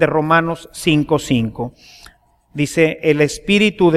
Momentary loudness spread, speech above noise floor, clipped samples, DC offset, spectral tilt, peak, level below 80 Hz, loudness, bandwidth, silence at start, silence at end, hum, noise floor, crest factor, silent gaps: 10 LU; 33 dB; under 0.1%; under 0.1%; -5.5 dB/octave; 0 dBFS; -44 dBFS; -16 LUFS; 15 kHz; 0 s; 0 s; none; -49 dBFS; 16 dB; none